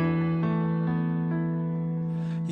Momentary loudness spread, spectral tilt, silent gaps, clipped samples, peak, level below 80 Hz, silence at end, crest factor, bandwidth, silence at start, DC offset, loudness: 4 LU; -10 dB/octave; none; under 0.1%; -16 dBFS; -58 dBFS; 0 s; 12 dB; 4.3 kHz; 0 s; under 0.1%; -28 LUFS